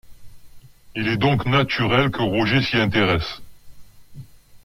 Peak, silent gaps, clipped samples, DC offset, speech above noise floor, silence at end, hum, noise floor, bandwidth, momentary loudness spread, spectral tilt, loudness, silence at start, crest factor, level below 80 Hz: -6 dBFS; none; under 0.1%; under 0.1%; 23 dB; 0.05 s; 50 Hz at -50 dBFS; -43 dBFS; 15.5 kHz; 10 LU; -6.5 dB/octave; -20 LUFS; 0.05 s; 16 dB; -44 dBFS